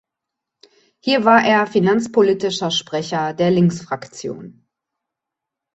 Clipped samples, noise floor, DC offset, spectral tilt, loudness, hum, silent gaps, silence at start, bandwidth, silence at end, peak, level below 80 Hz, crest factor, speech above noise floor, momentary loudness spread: under 0.1%; -84 dBFS; under 0.1%; -5.5 dB/octave; -17 LUFS; none; none; 1.05 s; 8.2 kHz; 1.25 s; -2 dBFS; -62 dBFS; 18 dB; 67 dB; 16 LU